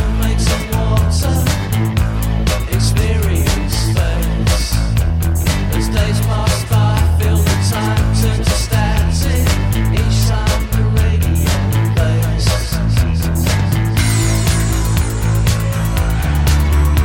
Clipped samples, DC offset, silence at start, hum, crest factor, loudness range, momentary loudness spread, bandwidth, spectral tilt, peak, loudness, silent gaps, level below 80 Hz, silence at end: under 0.1%; under 0.1%; 0 s; none; 12 dB; 1 LU; 3 LU; 17 kHz; -5.5 dB/octave; 0 dBFS; -15 LUFS; none; -18 dBFS; 0 s